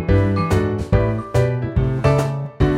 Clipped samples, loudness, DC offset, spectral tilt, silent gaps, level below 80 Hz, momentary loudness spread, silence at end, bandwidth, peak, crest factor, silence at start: under 0.1%; -19 LUFS; under 0.1%; -8 dB/octave; none; -28 dBFS; 3 LU; 0 s; 13.5 kHz; -2 dBFS; 16 dB; 0 s